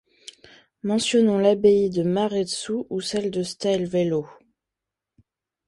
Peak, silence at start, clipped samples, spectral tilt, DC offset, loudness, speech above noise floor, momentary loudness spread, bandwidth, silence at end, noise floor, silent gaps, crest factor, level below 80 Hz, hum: -6 dBFS; 0.85 s; under 0.1%; -5.5 dB/octave; under 0.1%; -22 LUFS; 65 dB; 10 LU; 11.5 kHz; 1.4 s; -87 dBFS; none; 18 dB; -62 dBFS; none